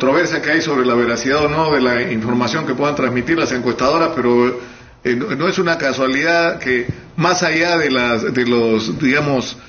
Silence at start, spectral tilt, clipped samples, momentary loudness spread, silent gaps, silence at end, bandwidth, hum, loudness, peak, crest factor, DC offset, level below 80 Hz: 0 s; -3.5 dB/octave; under 0.1%; 4 LU; none; 0 s; 7 kHz; none; -16 LUFS; -2 dBFS; 14 dB; under 0.1%; -46 dBFS